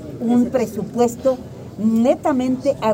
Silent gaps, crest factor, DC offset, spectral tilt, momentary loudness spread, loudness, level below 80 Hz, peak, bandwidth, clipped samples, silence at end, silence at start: none; 14 dB; under 0.1%; -6.5 dB/octave; 6 LU; -19 LUFS; -50 dBFS; -4 dBFS; 16 kHz; under 0.1%; 0 s; 0 s